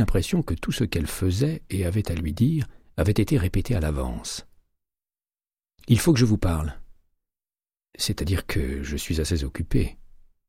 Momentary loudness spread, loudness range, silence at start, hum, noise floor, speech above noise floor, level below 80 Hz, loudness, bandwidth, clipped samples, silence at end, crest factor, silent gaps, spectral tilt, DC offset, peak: 9 LU; 4 LU; 0 s; none; under -90 dBFS; over 67 dB; -34 dBFS; -25 LUFS; 16 kHz; under 0.1%; 0.4 s; 18 dB; none; -6 dB/octave; under 0.1%; -6 dBFS